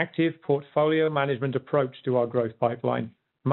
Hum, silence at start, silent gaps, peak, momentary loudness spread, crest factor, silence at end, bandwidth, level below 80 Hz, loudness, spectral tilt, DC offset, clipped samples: none; 0 s; none; -10 dBFS; 5 LU; 16 dB; 0 s; 4.2 kHz; -70 dBFS; -26 LUFS; -6 dB/octave; under 0.1%; under 0.1%